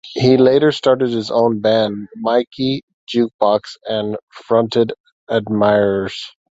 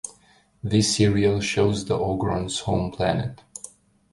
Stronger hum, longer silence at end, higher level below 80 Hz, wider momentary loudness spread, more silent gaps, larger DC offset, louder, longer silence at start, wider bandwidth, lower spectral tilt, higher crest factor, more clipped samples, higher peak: neither; second, 0.3 s vs 0.45 s; second, -54 dBFS vs -44 dBFS; second, 11 LU vs 19 LU; first, 2.47-2.51 s, 2.83-2.88 s, 2.94-3.07 s, 3.34-3.39 s, 4.23-4.27 s, 5.00-5.04 s, 5.12-5.27 s vs none; neither; first, -17 LUFS vs -23 LUFS; about the same, 0.05 s vs 0.05 s; second, 8 kHz vs 11.5 kHz; first, -6.5 dB/octave vs -5 dB/octave; about the same, 16 dB vs 18 dB; neither; first, 0 dBFS vs -6 dBFS